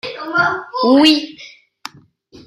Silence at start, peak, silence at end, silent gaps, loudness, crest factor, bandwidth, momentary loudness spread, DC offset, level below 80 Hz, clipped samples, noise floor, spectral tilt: 0.05 s; 0 dBFS; 1 s; none; -14 LUFS; 16 dB; 14 kHz; 24 LU; under 0.1%; -58 dBFS; under 0.1%; -46 dBFS; -4 dB/octave